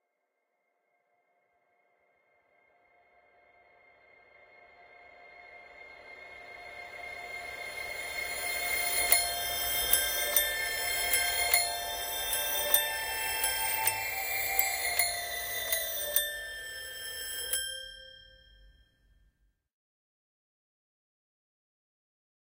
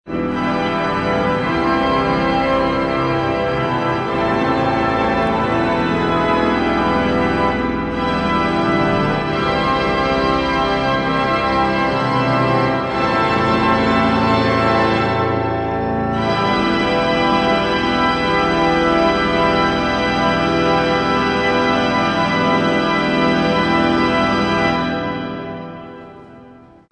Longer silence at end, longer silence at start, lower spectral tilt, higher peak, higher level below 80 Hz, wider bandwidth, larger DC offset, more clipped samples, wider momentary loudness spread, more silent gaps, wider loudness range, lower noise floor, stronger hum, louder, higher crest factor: first, 3.9 s vs 0.4 s; first, 4.6 s vs 0.05 s; second, 1 dB/octave vs -6 dB/octave; second, -6 dBFS vs -2 dBFS; second, -60 dBFS vs -36 dBFS; first, 16 kHz vs 10 kHz; neither; neither; first, 20 LU vs 4 LU; neither; first, 16 LU vs 2 LU; first, -81 dBFS vs -43 dBFS; neither; second, -29 LUFS vs -17 LUFS; first, 30 dB vs 14 dB